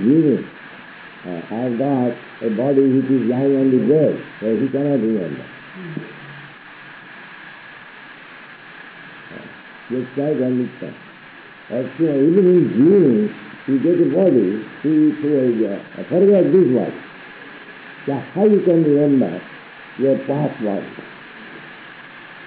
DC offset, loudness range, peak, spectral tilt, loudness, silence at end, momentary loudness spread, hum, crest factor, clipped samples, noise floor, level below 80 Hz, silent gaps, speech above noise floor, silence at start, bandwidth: under 0.1%; 17 LU; -4 dBFS; -8 dB/octave; -17 LUFS; 0 s; 23 LU; none; 14 dB; under 0.1%; -41 dBFS; -68 dBFS; none; 24 dB; 0 s; 4.6 kHz